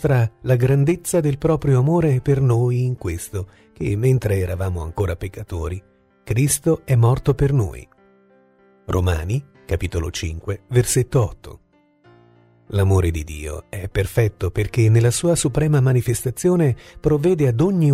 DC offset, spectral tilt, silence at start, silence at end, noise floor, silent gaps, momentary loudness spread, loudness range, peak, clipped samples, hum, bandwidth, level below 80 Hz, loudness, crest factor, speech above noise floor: under 0.1%; -6.5 dB/octave; 0 s; 0 s; -55 dBFS; none; 11 LU; 5 LU; -4 dBFS; under 0.1%; none; 15.5 kHz; -36 dBFS; -20 LUFS; 16 dB; 36 dB